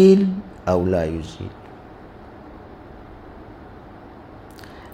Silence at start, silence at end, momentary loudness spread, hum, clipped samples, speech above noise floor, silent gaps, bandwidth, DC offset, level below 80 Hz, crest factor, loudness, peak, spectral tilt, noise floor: 0 s; 0.05 s; 22 LU; none; under 0.1%; 24 dB; none; 8.6 kHz; under 0.1%; -46 dBFS; 20 dB; -21 LUFS; -2 dBFS; -8 dB/octave; -41 dBFS